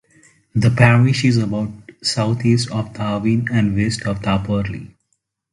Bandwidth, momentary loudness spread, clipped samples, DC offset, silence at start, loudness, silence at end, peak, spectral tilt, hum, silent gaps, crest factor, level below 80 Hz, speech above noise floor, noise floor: 11.5 kHz; 11 LU; under 0.1%; under 0.1%; 0.55 s; -18 LUFS; 0.65 s; 0 dBFS; -6 dB/octave; none; none; 18 dB; -42 dBFS; 54 dB; -70 dBFS